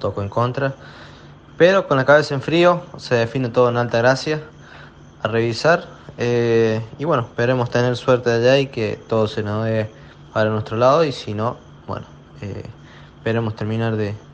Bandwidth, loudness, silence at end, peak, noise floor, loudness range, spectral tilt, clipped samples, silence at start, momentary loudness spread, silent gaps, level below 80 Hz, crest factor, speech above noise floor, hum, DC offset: 9 kHz; -19 LUFS; 0 s; 0 dBFS; -42 dBFS; 5 LU; -6.5 dB/octave; under 0.1%; 0 s; 16 LU; none; -52 dBFS; 18 dB; 23 dB; none; under 0.1%